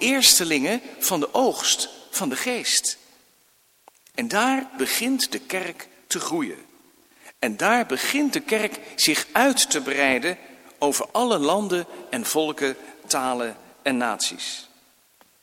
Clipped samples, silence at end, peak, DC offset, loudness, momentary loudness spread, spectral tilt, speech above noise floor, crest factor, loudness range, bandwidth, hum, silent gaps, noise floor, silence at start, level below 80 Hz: under 0.1%; 0.75 s; -2 dBFS; under 0.1%; -22 LUFS; 12 LU; -1.5 dB/octave; 38 dB; 22 dB; 5 LU; 17 kHz; none; none; -61 dBFS; 0 s; -68 dBFS